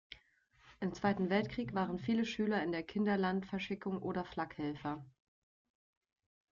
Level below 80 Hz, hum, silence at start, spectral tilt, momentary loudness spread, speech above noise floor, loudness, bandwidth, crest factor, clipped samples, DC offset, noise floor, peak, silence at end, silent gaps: -66 dBFS; none; 0.1 s; -7 dB/octave; 9 LU; 33 dB; -37 LUFS; 7.2 kHz; 18 dB; under 0.1%; under 0.1%; -70 dBFS; -20 dBFS; 1.4 s; none